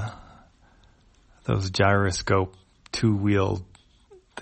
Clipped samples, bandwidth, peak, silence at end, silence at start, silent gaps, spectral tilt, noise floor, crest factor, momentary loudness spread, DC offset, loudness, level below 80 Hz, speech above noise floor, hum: under 0.1%; 8.8 kHz; -6 dBFS; 0 s; 0 s; none; -5.5 dB/octave; -58 dBFS; 20 dB; 14 LU; under 0.1%; -25 LUFS; -48 dBFS; 35 dB; none